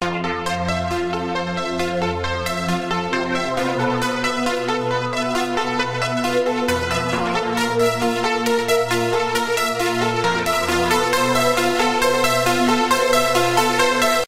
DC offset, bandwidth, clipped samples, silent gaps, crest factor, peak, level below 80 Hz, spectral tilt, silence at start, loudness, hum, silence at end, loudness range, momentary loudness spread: under 0.1%; 16 kHz; under 0.1%; none; 16 dB; -4 dBFS; -46 dBFS; -4 dB/octave; 0 s; -19 LUFS; none; 0 s; 5 LU; 6 LU